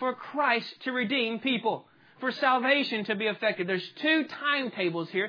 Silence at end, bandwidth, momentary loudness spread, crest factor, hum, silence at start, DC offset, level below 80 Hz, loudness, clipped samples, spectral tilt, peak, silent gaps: 0 s; 5.4 kHz; 7 LU; 18 dB; none; 0 s; under 0.1%; -84 dBFS; -28 LUFS; under 0.1%; -6 dB/octave; -10 dBFS; none